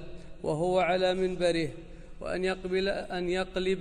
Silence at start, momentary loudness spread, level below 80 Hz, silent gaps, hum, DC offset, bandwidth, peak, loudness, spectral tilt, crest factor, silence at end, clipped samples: 0 s; 11 LU; -48 dBFS; none; none; under 0.1%; 10.5 kHz; -14 dBFS; -30 LUFS; -5.5 dB/octave; 16 dB; 0 s; under 0.1%